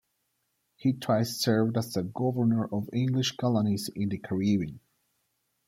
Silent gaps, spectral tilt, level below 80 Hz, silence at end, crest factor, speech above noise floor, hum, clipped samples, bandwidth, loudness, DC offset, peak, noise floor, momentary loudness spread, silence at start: none; -6 dB/octave; -66 dBFS; 0.9 s; 16 dB; 50 dB; none; under 0.1%; 16 kHz; -28 LUFS; under 0.1%; -12 dBFS; -77 dBFS; 5 LU; 0.8 s